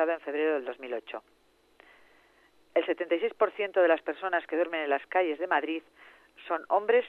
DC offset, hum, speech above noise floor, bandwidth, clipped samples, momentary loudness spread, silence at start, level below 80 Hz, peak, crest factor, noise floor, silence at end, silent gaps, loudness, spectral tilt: under 0.1%; none; 34 dB; 4.3 kHz; under 0.1%; 12 LU; 0 s; -80 dBFS; -12 dBFS; 18 dB; -63 dBFS; 0 s; none; -29 LUFS; -5 dB/octave